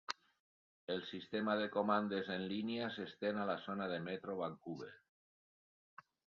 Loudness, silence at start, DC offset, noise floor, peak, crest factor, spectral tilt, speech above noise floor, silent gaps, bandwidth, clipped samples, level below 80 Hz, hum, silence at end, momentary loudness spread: -41 LUFS; 0.1 s; under 0.1%; under -90 dBFS; -22 dBFS; 22 dB; -3.5 dB/octave; over 50 dB; 0.40-0.87 s; 7.2 kHz; under 0.1%; -80 dBFS; none; 1.45 s; 12 LU